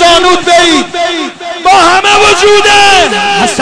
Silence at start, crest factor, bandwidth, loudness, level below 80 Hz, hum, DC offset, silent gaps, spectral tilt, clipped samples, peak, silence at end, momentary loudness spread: 0 s; 6 dB; 11 kHz; -5 LUFS; -34 dBFS; none; under 0.1%; none; -1.5 dB/octave; 0.3%; 0 dBFS; 0 s; 9 LU